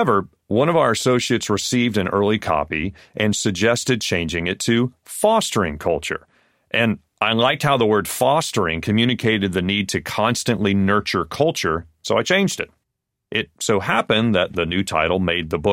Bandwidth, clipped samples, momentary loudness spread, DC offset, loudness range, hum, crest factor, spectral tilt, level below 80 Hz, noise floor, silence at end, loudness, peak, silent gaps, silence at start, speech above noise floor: 16.5 kHz; under 0.1%; 6 LU; under 0.1%; 2 LU; none; 16 dB; -4.5 dB/octave; -46 dBFS; -78 dBFS; 0 s; -20 LUFS; -4 dBFS; none; 0 s; 59 dB